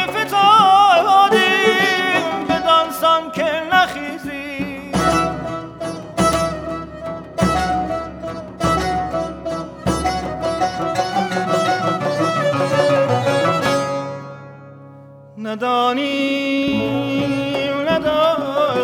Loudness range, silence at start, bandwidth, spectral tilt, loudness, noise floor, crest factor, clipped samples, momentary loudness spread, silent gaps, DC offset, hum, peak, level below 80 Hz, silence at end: 7 LU; 0 s; 20 kHz; -4.5 dB/octave; -17 LUFS; -41 dBFS; 16 dB; under 0.1%; 15 LU; none; under 0.1%; none; -2 dBFS; -40 dBFS; 0 s